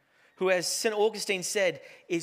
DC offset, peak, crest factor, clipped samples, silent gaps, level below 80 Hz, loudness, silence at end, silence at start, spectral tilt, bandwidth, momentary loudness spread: under 0.1%; -12 dBFS; 18 dB; under 0.1%; none; -88 dBFS; -28 LUFS; 0 s; 0.4 s; -2.5 dB/octave; 16 kHz; 6 LU